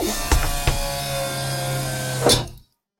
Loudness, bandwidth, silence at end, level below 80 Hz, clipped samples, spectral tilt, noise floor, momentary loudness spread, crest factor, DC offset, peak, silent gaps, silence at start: -22 LUFS; 17 kHz; 0.4 s; -28 dBFS; under 0.1%; -3.5 dB/octave; -46 dBFS; 7 LU; 20 dB; under 0.1%; -2 dBFS; none; 0 s